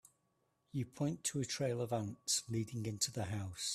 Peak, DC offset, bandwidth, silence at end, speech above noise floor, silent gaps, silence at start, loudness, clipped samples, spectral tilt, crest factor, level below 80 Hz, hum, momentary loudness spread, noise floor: -20 dBFS; under 0.1%; 15 kHz; 0 s; 41 dB; none; 0.75 s; -39 LUFS; under 0.1%; -4 dB/octave; 20 dB; -72 dBFS; none; 6 LU; -80 dBFS